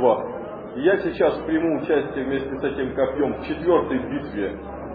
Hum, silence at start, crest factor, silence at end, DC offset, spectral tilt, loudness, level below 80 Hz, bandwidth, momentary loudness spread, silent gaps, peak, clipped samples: none; 0 s; 18 dB; 0 s; under 0.1%; -10 dB/octave; -23 LUFS; -46 dBFS; 5 kHz; 8 LU; none; -6 dBFS; under 0.1%